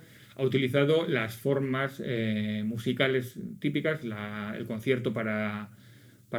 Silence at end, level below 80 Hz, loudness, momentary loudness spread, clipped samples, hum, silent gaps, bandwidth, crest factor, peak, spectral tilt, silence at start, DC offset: 0 s; -72 dBFS; -30 LUFS; 10 LU; under 0.1%; none; none; over 20 kHz; 20 dB; -10 dBFS; -7 dB/octave; 0 s; under 0.1%